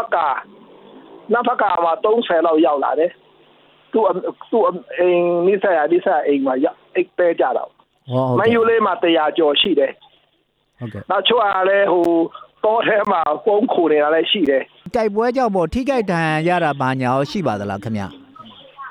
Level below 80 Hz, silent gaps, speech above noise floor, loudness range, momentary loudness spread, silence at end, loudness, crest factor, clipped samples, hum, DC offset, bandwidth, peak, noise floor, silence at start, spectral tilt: -52 dBFS; none; 47 dB; 2 LU; 9 LU; 0 s; -17 LUFS; 14 dB; under 0.1%; none; under 0.1%; 11 kHz; -2 dBFS; -64 dBFS; 0 s; -6.5 dB/octave